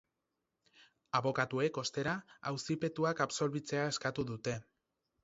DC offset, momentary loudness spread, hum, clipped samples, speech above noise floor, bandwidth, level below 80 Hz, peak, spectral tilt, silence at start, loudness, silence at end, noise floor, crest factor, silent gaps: under 0.1%; 7 LU; none; under 0.1%; 51 dB; 7.6 kHz; -70 dBFS; -16 dBFS; -4 dB/octave; 0.8 s; -36 LUFS; 0.6 s; -87 dBFS; 22 dB; none